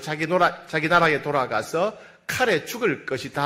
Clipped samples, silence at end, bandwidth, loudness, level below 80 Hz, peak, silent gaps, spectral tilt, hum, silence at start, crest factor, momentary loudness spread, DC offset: under 0.1%; 0 s; 16 kHz; -23 LUFS; -58 dBFS; -6 dBFS; none; -4.5 dB/octave; none; 0 s; 18 dB; 10 LU; under 0.1%